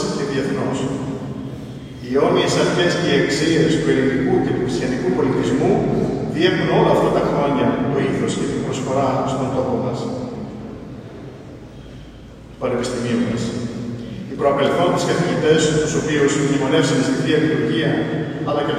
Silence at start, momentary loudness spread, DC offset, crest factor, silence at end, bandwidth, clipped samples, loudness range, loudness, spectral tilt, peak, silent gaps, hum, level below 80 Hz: 0 s; 16 LU; under 0.1%; 16 dB; 0 s; 14 kHz; under 0.1%; 8 LU; -19 LUFS; -5.5 dB/octave; -2 dBFS; none; none; -44 dBFS